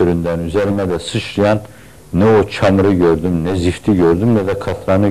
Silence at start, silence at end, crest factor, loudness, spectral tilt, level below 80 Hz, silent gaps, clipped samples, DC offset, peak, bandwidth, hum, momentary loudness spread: 0 s; 0 s; 10 dB; -15 LUFS; -7 dB/octave; -40 dBFS; none; under 0.1%; 1%; -4 dBFS; 13.5 kHz; none; 7 LU